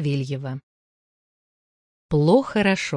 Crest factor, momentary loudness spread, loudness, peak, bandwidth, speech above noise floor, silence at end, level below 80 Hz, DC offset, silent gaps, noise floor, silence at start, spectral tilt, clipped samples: 18 dB; 15 LU; -21 LUFS; -4 dBFS; 10.5 kHz; over 69 dB; 0 s; -52 dBFS; under 0.1%; 0.63-2.09 s; under -90 dBFS; 0 s; -6.5 dB/octave; under 0.1%